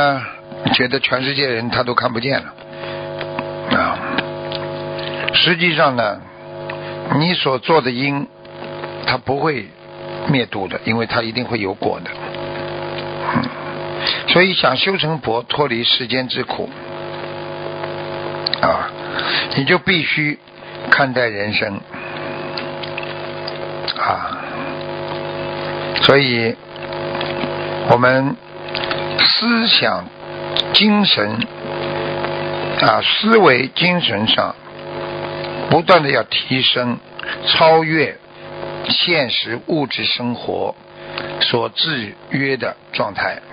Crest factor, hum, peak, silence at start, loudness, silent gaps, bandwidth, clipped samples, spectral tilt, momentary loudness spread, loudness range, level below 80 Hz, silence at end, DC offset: 18 dB; none; 0 dBFS; 0 s; -17 LUFS; none; 8 kHz; under 0.1%; -7 dB/octave; 15 LU; 6 LU; -50 dBFS; 0 s; under 0.1%